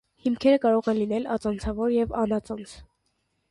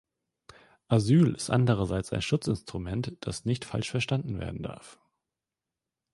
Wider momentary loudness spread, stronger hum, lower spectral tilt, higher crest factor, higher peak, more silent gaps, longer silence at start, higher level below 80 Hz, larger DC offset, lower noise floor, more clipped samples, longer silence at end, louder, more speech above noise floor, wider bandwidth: about the same, 12 LU vs 12 LU; neither; about the same, -6.5 dB/octave vs -6.5 dB/octave; about the same, 18 dB vs 20 dB; about the same, -8 dBFS vs -10 dBFS; neither; second, 0.25 s vs 0.9 s; about the same, -46 dBFS vs -50 dBFS; neither; second, -74 dBFS vs -89 dBFS; neither; second, 0.65 s vs 1.2 s; first, -25 LUFS vs -29 LUFS; second, 49 dB vs 62 dB; about the same, 11.5 kHz vs 11.5 kHz